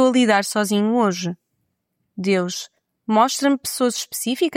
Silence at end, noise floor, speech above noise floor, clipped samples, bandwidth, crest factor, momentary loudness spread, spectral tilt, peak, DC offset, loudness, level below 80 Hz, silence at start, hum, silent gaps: 0 s; -73 dBFS; 54 dB; under 0.1%; 16.5 kHz; 16 dB; 15 LU; -4 dB/octave; -4 dBFS; under 0.1%; -20 LUFS; -70 dBFS; 0 s; none; none